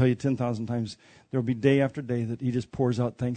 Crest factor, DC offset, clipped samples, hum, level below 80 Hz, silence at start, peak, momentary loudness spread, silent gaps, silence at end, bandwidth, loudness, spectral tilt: 20 dB; under 0.1%; under 0.1%; none; -60 dBFS; 0 s; -8 dBFS; 9 LU; none; 0 s; 9.2 kHz; -28 LUFS; -8 dB/octave